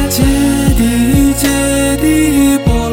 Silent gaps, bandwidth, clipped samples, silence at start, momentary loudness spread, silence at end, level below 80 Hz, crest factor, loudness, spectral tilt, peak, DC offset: none; 17 kHz; under 0.1%; 0 s; 2 LU; 0 s; -20 dBFS; 10 dB; -11 LUFS; -5 dB/octave; 0 dBFS; 0.4%